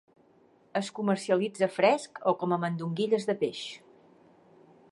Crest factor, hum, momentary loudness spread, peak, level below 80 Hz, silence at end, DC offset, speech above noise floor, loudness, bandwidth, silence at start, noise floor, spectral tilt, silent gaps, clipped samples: 20 dB; none; 10 LU; -10 dBFS; -80 dBFS; 1.15 s; under 0.1%; 34 dB; -29 LUFS; 11.5 kHz; 0.75 s; -62 dBFS; -5.5 dB/octave; none; under 0.1%